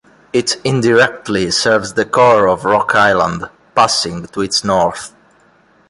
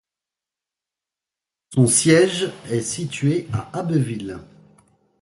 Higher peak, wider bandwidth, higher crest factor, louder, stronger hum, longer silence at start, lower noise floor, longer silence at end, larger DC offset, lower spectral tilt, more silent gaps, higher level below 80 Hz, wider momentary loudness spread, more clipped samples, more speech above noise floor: about the same, 0 dBFS vs -2 dBFS; about the same, 11.5 kHz vs 11.5 kHz; second, 14 dB vs 20 dB; first, -13 LUFS vs -20 LUFS; neither; second, 0.35 s vs 1.7 s; second, -51 dBFS vs -88 dBFS; about the same, 0.8 s vs 0.8 s; neither; about the same, -3.5 dB/octave vs -4.5 dB/octave; neither; first, -46 dBFS vs -54 dBFS; second, 9 LU vs 13 LU; neither; second, 38 dB vs 68 dB